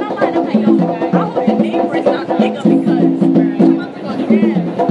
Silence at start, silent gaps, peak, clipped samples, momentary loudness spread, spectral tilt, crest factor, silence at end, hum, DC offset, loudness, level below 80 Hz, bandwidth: 0 s; none; 0 dBFS; under 0.1%; 4 LU; -8.5 dB/octave; 12 dB; 0 s; none; under 0.1%; -14 LUFS; -62 dBFS; 8.2 kHz